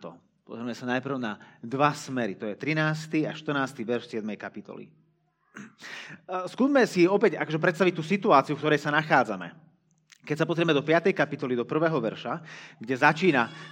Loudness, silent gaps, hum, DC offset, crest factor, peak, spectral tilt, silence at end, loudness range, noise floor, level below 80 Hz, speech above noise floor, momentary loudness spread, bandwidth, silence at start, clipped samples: -26 LUFS; none; none; under 0.1%; 22 dB; -4 dBFS; -6 dB/octave; 0 s; 7 LU; -69 dBFS; -80 dBFS; 43 dB; 19 LU; 16 kHz; 0 s; under 0.1%